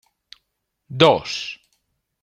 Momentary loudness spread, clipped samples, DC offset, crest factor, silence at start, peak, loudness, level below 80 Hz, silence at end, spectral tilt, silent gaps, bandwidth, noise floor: 21 LU; under 0.1%; under 0.1%; 22 dB; 0.9 s; -2 dBFS; -18 LUFS; -60 dBFS; 0.7 s; -5 dB/octave; none; 11.5 kHz; -76 dBFS